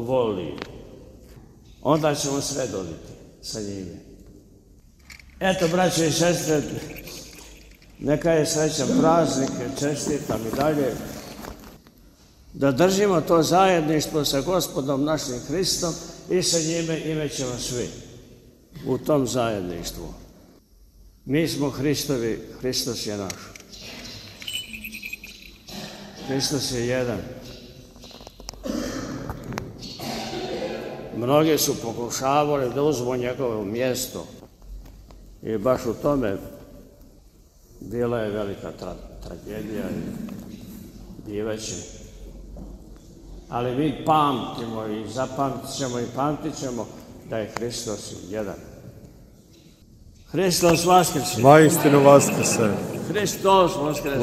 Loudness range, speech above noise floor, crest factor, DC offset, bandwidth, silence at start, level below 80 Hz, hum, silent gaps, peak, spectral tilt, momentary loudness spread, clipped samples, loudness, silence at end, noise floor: 12 LU; 30 dB; 24 dB; under 0.1%; 16 kHz; 0 s; -48 dBFS; none; none; 0 dBFS; -4.5 dB/octave; 21 LU; under 0.1%; -23 LUFS; 0 s; -53 dBFS